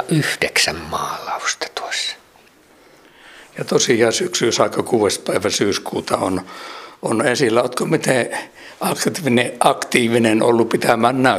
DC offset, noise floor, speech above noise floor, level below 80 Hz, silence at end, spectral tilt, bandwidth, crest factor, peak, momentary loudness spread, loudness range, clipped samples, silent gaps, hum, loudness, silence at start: under 0.1%; -50 dBFS; 32 dB; -56 dBFS; 0 s; -3.5 dB/octave; 15.5 kHz; 18 dB; 0 dBFS; 10 LU; 4 LU; under 0.1%; none; none; -18 LUFS; 0 s